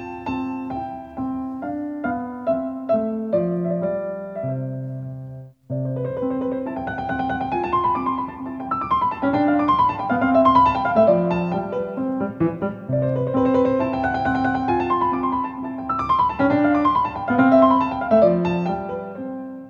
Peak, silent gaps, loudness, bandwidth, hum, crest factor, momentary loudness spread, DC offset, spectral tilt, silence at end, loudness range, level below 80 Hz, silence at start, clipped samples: -2 dBFS; none; -21 LUFS; 6.8 kHz; none; 18 dB; 13 LU; under 0.1%; -9 dB/octave; 0 s; 8 LU; -48 dBFS; 0 s; under 0.1%